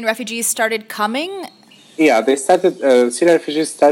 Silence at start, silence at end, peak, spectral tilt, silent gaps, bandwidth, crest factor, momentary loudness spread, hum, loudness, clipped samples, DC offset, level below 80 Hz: 0 s; 0 s; 0 dBFS; -3 dB/octave; none; 16.5 kHz; 16 dB; 11 LU; none; -16 LUFS; under 0.1%; under 0.1%; -74 dBFS